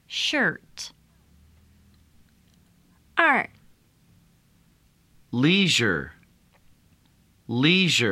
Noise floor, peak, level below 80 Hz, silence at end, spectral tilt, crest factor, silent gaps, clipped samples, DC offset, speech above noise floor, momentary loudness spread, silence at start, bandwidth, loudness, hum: -61 dBFS; -4 dBFS; -60 dBFS; 0 s; -4 dB/octave; 24 dB; none; under 0.1%; under 0.1%; 39 dB; 19 LU; 0.1 s; 15 kHz; -22 LUFS; none